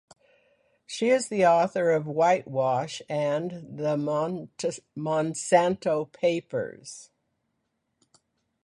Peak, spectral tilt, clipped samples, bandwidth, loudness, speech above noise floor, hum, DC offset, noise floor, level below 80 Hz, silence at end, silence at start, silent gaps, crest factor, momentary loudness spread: -8 dBFS; -5 dB/octave; under 0.1%; 11.5 kHz; -26 LUFS; 52 dB; none; under 0.1%; -78 dBFS; -70 dBFS; 1.6 s; 0.9 s; none; 20 dB; 12 LU